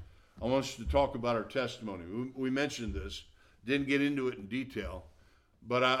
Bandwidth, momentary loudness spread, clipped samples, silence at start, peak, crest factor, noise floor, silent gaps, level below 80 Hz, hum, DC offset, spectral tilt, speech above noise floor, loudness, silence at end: 13.5 kHz; 12 LU; under 0.1%; 0 s; -14 dBFS; 20 dB; -64 dBFS; none; -48 dBFS; none; under 0.1%; -5 dB/octave; 31 dB; -34 LUFS; 0 s